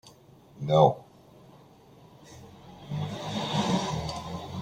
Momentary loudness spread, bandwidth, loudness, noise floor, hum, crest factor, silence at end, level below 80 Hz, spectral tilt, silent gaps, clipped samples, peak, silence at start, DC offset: 27 LU; 15.5 kHz; -28 LUFS; -54 dBFS; none; 24 dB; 0 s; -56 dBFS; -6 dB/octave; none; under 0.1%; -6 dBFS; 0.05 s; under 0.1%